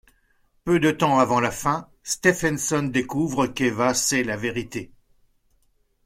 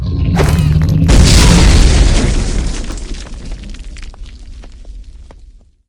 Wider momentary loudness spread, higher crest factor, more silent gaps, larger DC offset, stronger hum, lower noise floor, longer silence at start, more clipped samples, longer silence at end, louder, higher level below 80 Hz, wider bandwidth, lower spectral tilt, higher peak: second, 10 LU vs 23 LU; first, 20 dB vs 12 dB; neither; neither; neither; first, -65 dBFS vs -40 dBFS; first, 0.65 s vs 0 s; second, under 0.1% vs 0.4%; first, 1.2 s vs 0.55 s; second, -22 LUFS vs -11 LUFS; second, -52 dBFS vs -14 dBFS; about the same, 16.5 kHz vs 16.5 kHz; about the same, -4 dB/octave vs -5 dB/octave; second, -4 dBFS vs 0 dBFS